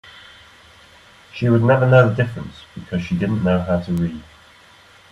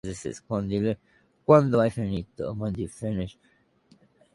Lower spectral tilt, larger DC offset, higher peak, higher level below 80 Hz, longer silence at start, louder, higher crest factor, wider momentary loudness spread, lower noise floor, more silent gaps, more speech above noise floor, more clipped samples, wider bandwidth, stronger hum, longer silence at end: about the same, -8.5 dB/octave vs -7.5 dB/octave; neither; first, 0 dBFS vs -4 dBFS; about the same, -50 dBFS vs -50 dBFS; about the same, 0.05 s vs 0.05 s; first, -18 LUFS vs -26 LUFS; about the same, 20 dB vs 22 dB; first, 21 LU vs 15 LU; second, -48 dBFS vs -61 dBFS; neither; second, 31 dB vs 36 dB; neither; second, 10 kHz vs 11.5 kHz; neither; second, 0.9 s vs 1.05 s